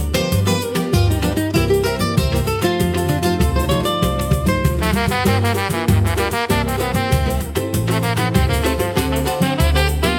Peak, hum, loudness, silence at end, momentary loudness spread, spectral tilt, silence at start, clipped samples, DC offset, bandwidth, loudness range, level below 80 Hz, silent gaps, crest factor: -2 dBFS; none; -18 LUFS; 0 s; 3 LU; -5.5 dB/octave; 0 s; under 0.1%; under 0.1%; 17.5 kHz; 1 LU; -26 dBFS; none; 14 dB